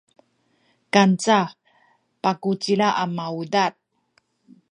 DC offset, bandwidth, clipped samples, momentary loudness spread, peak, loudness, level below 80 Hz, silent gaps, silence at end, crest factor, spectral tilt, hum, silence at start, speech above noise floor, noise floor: under 0.1%; 10.5 kHz; under 0.1%; 9 LU; 0 dBFS; -21 LUFS; -74 dBFS; none; 1 s; 22 dB; -5 dB/octave; none; 0.95 s; 46 dB; -66 dBFS